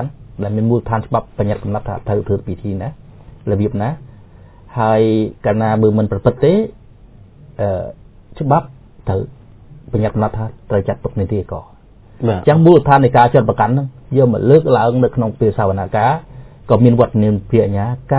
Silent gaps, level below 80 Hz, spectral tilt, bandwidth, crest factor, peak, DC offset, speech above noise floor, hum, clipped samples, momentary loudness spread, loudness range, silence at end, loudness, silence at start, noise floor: none; -38 dBFS; -12.5 dB/octave; 4 kHz; 16 dB; 0 dBFS; under 0.1%; 27 dB; none; 0.1%; 13 LU; 9 LU; 0 s; -15 LUFS; 0 s; -41 dBFS